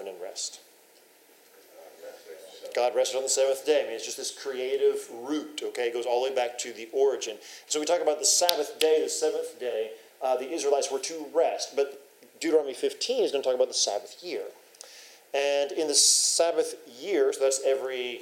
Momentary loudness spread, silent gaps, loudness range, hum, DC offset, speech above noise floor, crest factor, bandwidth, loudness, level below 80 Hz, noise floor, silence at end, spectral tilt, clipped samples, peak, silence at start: 14 LU; none; 5 LU; none; under 0.1%; 31 dB; 28 dB; 16 kHz; -27 LUFS; under -90 dBFS; -58 dBFS; 0 s; 0.5 dB/octave; under 0.1%; 0 dBFS; 0 s